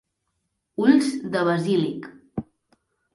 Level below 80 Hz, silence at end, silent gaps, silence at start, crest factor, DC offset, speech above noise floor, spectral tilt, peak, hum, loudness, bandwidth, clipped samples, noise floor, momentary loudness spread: -62 dBFS; 0.7 s; none; 0.8 s; 20 dB; under 0.1%; 55 dB; -6.5 dB/octave; -4 dBFS; none; -22 LUFS; 11.5 kHz; under 0.1%; -76 dBFS; 17 LU